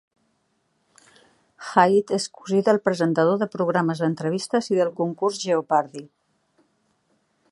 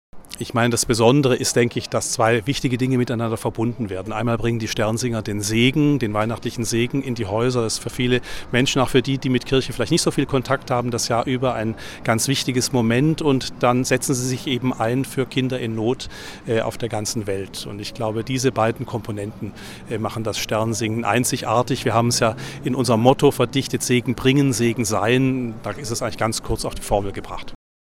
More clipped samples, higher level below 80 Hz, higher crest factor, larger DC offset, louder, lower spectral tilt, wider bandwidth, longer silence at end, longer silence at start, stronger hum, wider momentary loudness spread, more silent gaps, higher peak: neither; second, -74 dBFS vs -42 dBFS; about the same, 22 dB vs 20 dB; neither; about the same, -22 LUFS vs -21 LUFS; about the same, -5.5 dB/octave vs -5 dB/octave; second, 11.5 kHz vs 16.5 kHz; first, 1.45 s vs 0.45 s; first, 1.6 s vs 0.15 s; neither; about the same, 8 LU vs 10 LU; neither; about the same, -2 dBFS vs 0 dBFS